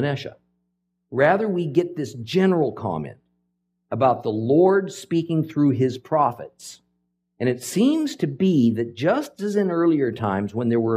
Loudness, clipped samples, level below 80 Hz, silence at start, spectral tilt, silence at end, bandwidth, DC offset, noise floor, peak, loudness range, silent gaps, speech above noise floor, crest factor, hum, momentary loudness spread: -22 LUFS; under 0.1%; -68 dBFS; 0 s; -7 dB/octave; 0 s; 15.5 kHz; under 0.1%; -75 dBFS; -4 dBFS; 2 LU; none; 54 dB; 16 dB; none; 12 LU